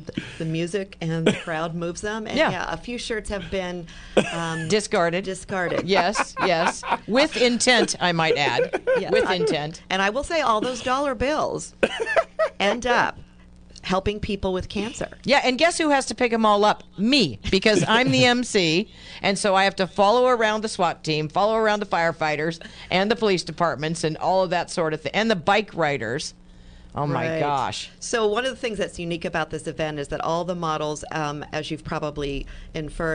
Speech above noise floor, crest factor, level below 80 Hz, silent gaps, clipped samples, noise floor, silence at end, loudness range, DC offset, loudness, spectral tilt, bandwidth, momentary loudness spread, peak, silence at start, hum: 25 dB; 20 dB; -46 dBFS; none; under 0.1%; -47 dBFS; 0 s; 6 LU; under 0.1%; -23 LUFS; -4 dB/octave; 10.5 kHz; 10 LU; -2 dBFS; 0 s; none